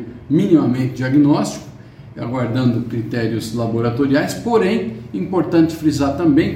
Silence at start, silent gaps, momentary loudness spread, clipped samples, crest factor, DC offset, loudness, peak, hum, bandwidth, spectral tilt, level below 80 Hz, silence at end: 0 s; none; 10 LU; under 0.1%; 16 dB; under 0.1%; -17 LUFS; 0 dBFS; none; 16 kHz; -7 dB/octave; -46 dBFS; 0 s